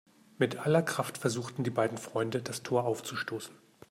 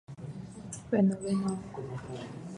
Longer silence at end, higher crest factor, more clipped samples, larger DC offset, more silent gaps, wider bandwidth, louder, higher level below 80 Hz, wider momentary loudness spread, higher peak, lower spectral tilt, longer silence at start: first, 0.35 s vs 0 s; about the same, 20 dB vs 18 dB; neither; neither; neither; first, 16 kHz vs 11 kHz; about the same, -32 LUFS vs -33 LUFS; second, -74 dBFS vs -62 dBFS; second, 8 LU vs 16 LU; about the same, -14 dBFS vs -14 dBFS; second, -5 dB/octave vs -7 dB/octave; first, 0.4 s vs 0.1 s